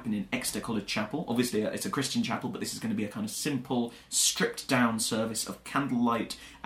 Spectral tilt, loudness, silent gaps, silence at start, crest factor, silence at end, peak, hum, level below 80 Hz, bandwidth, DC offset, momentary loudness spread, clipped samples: -3.5 dB/octave; -30 LUFS; none; 0 s; 18 dB; 0 s; -12 dBFS; none; -62 dBFS; 16 kHz; under 0.1%; 8 LU; under 0.1%